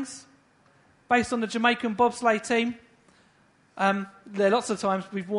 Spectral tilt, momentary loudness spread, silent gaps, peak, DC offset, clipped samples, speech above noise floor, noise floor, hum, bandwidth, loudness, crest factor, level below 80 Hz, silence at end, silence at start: -4.5 dB/octave; 10 LU; none; -6 dBFS; under 0.1%; under 0.1%; 37 dB; -62 dBFS; none; 11 kHz; -25 LUFS; 20 dB; -64 dBFS; 0 s; 0 s